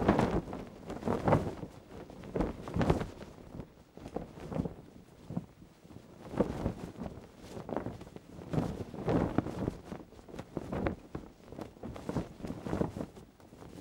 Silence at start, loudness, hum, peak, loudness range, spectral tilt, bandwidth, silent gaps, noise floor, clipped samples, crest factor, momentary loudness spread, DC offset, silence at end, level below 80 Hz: 0 s; -37 LUFS; none; -12 dBFS; 6 LU; -7.5 dB/octave; 16.5 kHz; none; -55 dBFS; under 0.1%; 26 dB; 20 LU; under 0.1%; 0 s; -50 dBFS